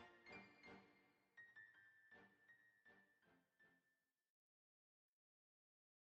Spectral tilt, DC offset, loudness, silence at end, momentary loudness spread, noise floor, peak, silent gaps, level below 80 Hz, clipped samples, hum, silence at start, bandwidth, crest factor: -2.5 dB/octave; under 0.1%; -65 LUFS; 2.15 s; 7 LU; under -90 dBFS; -48 dBFS; none; under -90 dBFS; under 0.1%; none; 0 s; 7.2 kHz; 22 dB